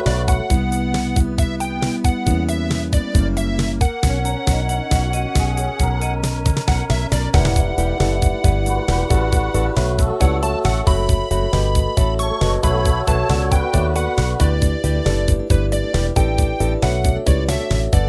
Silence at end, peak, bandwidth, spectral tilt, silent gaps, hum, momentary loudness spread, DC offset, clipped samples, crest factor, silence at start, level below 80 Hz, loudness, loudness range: 0 s; -2 dBFS; 11 kHz; -6 dB/octave; none; none; 3 LU; under 0.1%; under 0.1%; 16 dB; 0 s; -20 dBFS; -19 LUFS; 2 LU